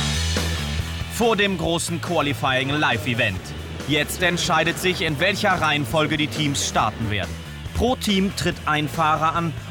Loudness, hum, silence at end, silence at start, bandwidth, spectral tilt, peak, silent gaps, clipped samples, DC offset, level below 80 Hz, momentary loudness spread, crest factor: -21 LUFS; none; 0 s; 0 s; 19.5 kHz; -4 dB/octave; -8 dBFS; none; under 0.1%; under 0.1%; -38 dBFS; 7 LU; 14 dB